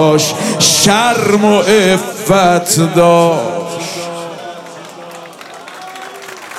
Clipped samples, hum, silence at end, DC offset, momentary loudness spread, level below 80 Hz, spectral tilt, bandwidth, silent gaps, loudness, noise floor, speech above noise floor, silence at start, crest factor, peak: under 0.1%; none; 0 s; under 0.1%; 21 LU; -50 dBFS; -3.5 dB/octave; 16.5 kHz; none; -11 LUFS; -31 dBFS; 21 dB; 0 s; 12 dB; 0 dBFS